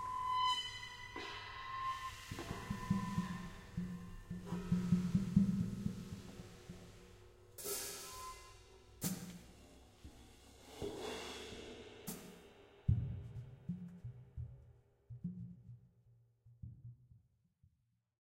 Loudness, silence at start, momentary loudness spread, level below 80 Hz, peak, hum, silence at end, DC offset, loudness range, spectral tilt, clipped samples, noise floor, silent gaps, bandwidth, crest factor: -42 LUFS; 0 s; 24 LU; -58 dBFS; -18 dBFS; none; 1 s; under 0.1%; 13 LU; -5 dB/octave; under 0.1%; -81 dBFS; none; 16 kHz; 26 dB